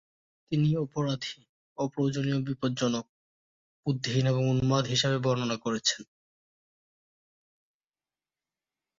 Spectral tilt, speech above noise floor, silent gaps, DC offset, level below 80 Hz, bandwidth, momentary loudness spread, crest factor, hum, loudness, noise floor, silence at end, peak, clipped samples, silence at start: -5.5 dB/octave; over 62 dB; 1.49-1.76 s, 3.09-3.83 s; under 0.1%; -62 dBFS; 7.8 kHz; 9 LU; 20 dB; none; -29 LUFS; under -90 dBFS; 2.95 s; -12 dBFS; under 0.1%; 0.5 s